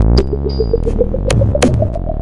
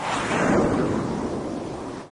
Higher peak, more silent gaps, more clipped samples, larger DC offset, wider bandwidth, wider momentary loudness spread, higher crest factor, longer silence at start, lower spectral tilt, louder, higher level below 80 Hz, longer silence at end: first, 0 dBFS vs -10 dBFS; neither; neither; neither; about the same, 11.5 kHz vs 10.5 kHz; second, 5 LU vs 11 LU; about the same, 12 dB vs 14 dB; about the same, 0 s vs 0 s; about the same, -6.5 dB/octave vs -5.5 dB/octave; first, -15 LUFS vs -24 LUFS; first, -18 dBFS vs -44 dBFS; about the same, 0 s vs 0.05 s